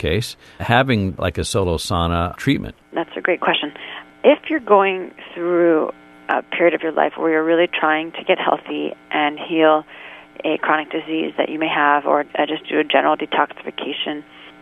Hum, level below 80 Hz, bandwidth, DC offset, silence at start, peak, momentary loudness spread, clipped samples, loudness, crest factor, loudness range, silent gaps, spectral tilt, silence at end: none; -44 dBFS; 13 kHz; under 0.1%; 0 s; 0 dBFS; 11 LU; under 0.1%; -19 LUFS; 18 dB; 2 LU; none; -5.5 dB/octave; 0.1 s